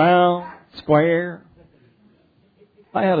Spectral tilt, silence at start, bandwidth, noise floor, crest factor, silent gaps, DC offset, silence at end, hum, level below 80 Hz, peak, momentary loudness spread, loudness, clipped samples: -10 dB/octave; 0 s; 5 kHz; -58 dBFS; 18 dB; none; under 0.1%; 0 s; none; -60 dBFS; -4 dBFS; 20 LU; -19 LUFS; under 0.1%